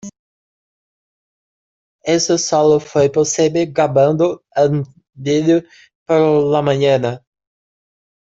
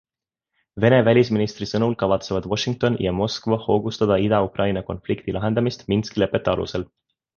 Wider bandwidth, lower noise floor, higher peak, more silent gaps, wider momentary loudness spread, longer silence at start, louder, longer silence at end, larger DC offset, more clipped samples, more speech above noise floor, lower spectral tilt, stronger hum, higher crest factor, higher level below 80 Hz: first, 8 kHz vs 7.2 kHz; first, under -90 dBFS vs -84 dBFS; about the same, -2 dBFS vs -2 dBFS; first, 0.19-1.99 s, 5.95-6.06 s vs none; about the same, 8 LU vs 9 LU; second, 0.05 s vs 0.75 s; first, -15 LUFS vs -21 LUFS; first, 1.05 s vs 0.55 s; neither; neither; first, over 75 dB vs 64 dB; second, -5 dB/octave vs -6.5 dB/octave; neither; about the same, 16 dB vs 18 dB; second, -56 dBFS vs -46 dBFS